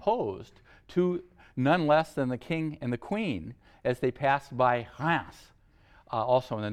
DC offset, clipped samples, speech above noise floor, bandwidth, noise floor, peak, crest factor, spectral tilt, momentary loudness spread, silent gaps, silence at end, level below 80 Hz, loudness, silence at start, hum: under 0.1%; under 0.1%; 31 dB; 13.5 kHz; -59 dBFS; -12 dBFS; 18 dB; -7.5 dB/octave; 11 LU; none; 0 s; -60 dBFS; -29 LUFS; 0 s; none